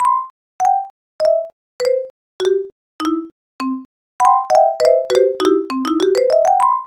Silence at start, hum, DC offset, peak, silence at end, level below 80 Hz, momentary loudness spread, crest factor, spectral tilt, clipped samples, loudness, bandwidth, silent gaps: 0 s; none; under 0.1%; 0 dBFS; 0 s; -60 dBFS; 15 LU; 16 dB; -3 dB/octave; under 0.1%; -16 LUFS; 15.5 kHz; 0.30-0.59 s, 0.90-1.19 s, 1.53-1.79 s, 2.10-2.39 s, 2.72-2.99 s, 3.32-3.59 s, 3.85-4.19 s